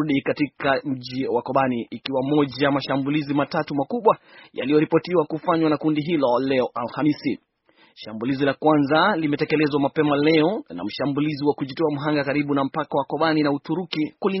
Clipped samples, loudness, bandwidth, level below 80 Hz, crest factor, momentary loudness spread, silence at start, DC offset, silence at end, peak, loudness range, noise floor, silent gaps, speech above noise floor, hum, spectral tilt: under 0.1%; -22 LUFS; 6 kHz; -62 dBFS; 18 dB; 8 LU; 0 s; under 0.1%; 0 s; -4 dBFS; 2 LU; -58 dBFS; none; 37 dB; none; -4.5 dB/octave